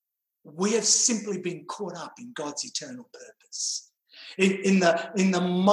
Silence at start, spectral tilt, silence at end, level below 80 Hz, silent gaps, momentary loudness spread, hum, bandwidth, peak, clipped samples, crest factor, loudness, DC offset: 0.45 s; -3.5 dB/octave; 0 s; -76 dBFS; none; 19 LU; none; 12 kHz; -8 dBFS; under 0.1%; 20 dB; -25 LUFS; under 0.1%